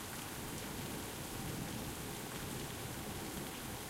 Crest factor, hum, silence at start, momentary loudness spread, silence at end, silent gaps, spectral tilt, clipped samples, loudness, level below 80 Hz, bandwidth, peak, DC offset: 16 dB; none; 0 s; 1 LU; 0 s; none; -3.5 dB/octave; under 0.1%; -43 LUFS; -56 dBFS; 16 kHz; -28 dBFS; under 0.1%